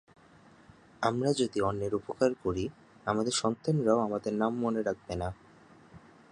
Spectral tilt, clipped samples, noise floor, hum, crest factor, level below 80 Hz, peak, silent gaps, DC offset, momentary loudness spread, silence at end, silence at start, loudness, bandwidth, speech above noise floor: -5.5 dB/octave; under 0.1%; -58 dBFS; none; 22 dB; -56 dBFS; -10 dBFS; none; under 0.1%; 9 LU; 0.35 s; 1 s; -31 LUFS; 11 kHz; 28 dB